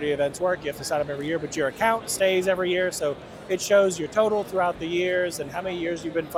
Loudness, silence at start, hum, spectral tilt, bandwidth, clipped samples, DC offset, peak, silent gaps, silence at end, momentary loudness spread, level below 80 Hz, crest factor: -25 LUFS; 0 s; none; -4 dB/octave; 16.5 kHz; under 0.1%; under 0.1%; -8 dBFS; none; 0 s; 8 LU; -56 dBFS; 18 dB